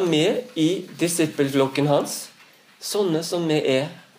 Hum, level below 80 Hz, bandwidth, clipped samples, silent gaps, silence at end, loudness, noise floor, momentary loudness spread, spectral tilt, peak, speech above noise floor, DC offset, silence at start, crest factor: none; -72 dBFS; 15.5 kHz; under 0.1%; none; 0.2 s; -22 LUFS; -52 dBFS; 8 LU; -4.5 dB/octave; -6 dBFS; 30 dB; under 0.1%; 0 s; 16 dB